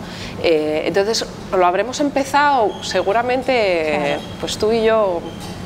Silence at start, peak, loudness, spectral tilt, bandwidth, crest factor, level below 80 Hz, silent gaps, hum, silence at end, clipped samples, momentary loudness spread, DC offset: 0 s; -4 dBFS; -18 LUFS; -4 dB/octave; 16 kHz; 14 dB; -44 dBFS; none; none; 0 s; under 0.1%; 7 LU; under 0.1%